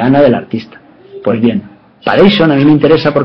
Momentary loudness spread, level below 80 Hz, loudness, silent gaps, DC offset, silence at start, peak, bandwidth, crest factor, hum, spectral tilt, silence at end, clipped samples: 13 LU; -44 dBFS; -10 LUFS; none; under 0.1%; 0 s; 0 dBFS; 6.2 kHz; 10 dB; none; -8.5 dB/octave; 0 s; 0.2%